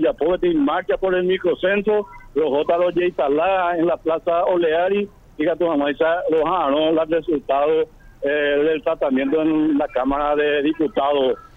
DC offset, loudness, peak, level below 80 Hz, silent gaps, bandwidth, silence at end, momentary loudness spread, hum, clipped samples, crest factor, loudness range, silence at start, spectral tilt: under 0.1%; -19 LUFS; -8 dBFS; -46 dBFS; none; 4.1 kHz; 0.15 s; 3 LU; none; under 0.1%; 12 dB; 0 LU; 0 s; -7.5 dB/octave